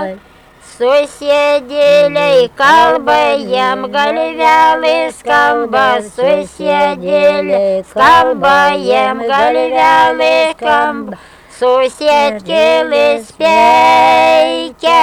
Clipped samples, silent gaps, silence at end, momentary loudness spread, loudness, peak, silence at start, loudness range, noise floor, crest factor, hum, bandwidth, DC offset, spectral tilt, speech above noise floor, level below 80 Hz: under 0.1%; none; 0 s; 7 LU; -10 LUFS; 0 dBFS; 0 s; 2 LU; -39 dBFS; 10 dB; none; 18 kHz; under 0.1%; -3.5 dB/octave; 29 dB; -48 dBFS